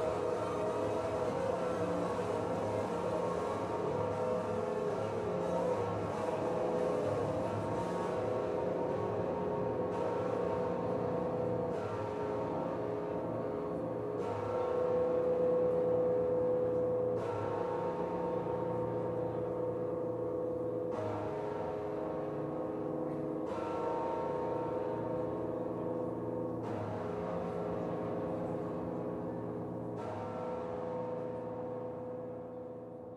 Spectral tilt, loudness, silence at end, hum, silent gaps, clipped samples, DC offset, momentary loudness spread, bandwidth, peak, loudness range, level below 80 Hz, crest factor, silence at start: -7.5 dB/octave; -36 LUFS; 0 s; none; none; under 0.1%; under 0.1%; 7 LU; 11.5 kHz; -22 dBFS; 6 LU; -62 dBFS; 14 dB; 0 s